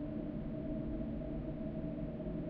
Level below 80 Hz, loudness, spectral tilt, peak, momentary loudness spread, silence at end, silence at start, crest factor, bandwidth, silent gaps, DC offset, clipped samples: -48 dBFS; -42 LUFS; -9.5 dB/octave; -28 dBFS; 1 LU; 0 s; 0 s; 12 dB; 5 kHz; none; under 0.1%; under 0.1%